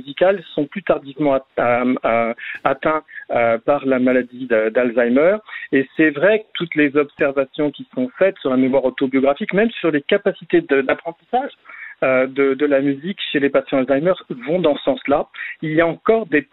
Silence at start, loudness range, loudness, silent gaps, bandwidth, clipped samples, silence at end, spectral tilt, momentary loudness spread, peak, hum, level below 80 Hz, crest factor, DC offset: 0.05 s; 2 LU; -18 LUFS; none; 4.1 kHz; under 0.1%; 0.1 s; -9.5 dB/octave; 7 LU; -2 dBFS; none; -54 dBFS; 16 dB; under 0.1%